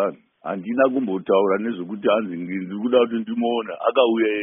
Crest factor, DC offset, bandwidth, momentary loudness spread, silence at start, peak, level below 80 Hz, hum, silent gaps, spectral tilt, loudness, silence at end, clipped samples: 18 dB; under 0.1%; 3.8 kHz; 10 LU; 0 s; -4 dBFS; -70 dBFS; none; none; -2.5 dB/octave; -22 LUFS; 0 s; under 0.1%